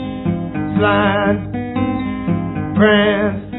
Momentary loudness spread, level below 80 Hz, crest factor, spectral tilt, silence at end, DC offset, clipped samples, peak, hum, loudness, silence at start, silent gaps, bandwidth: 9 LU; -40 dBFS; 16 dB; -10.5 dB/octave; 0 s; under 0.1%; under 0.1%; 0 dBFS; none; -17 LUFS; 0 s; none; 4.1 kHz